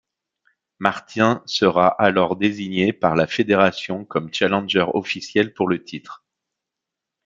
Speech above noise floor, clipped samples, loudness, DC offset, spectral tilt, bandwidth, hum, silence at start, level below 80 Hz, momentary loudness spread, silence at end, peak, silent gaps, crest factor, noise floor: 65 dB; under 0.1%; -20 LUFS; under 0.1%; -5.5 dB/octave; 7.8 kHz; none; 0.8 s; -62 dBFS; 9 LU; 1.1 s; 0 dBFS; none; 20 dB; -85 dBFS